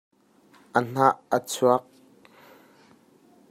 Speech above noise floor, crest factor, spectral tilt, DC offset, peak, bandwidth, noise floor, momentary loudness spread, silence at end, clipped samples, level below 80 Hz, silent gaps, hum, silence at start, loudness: 35 dB; 24 dB; -5 dB/octave; under 0.1%; -4 dBFS; 16 kHz; -58 dBFS; 6 LU; 1.7 s; under 0.1%; -74 dBFS; none; none; 0.75 s; -24 LUFS